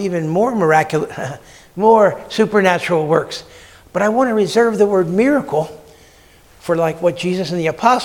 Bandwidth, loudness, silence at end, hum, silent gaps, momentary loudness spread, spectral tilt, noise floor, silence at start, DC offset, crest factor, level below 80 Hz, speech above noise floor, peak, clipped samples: 17 kHz; -16 LUFS; 0 s; none; none; 14 LU; -6 dB/octave; -47 dBFS; 0 s; under 0.1%; 16 dB; -52 dBFS; 31 dB; 0 dBFS; under 0.1%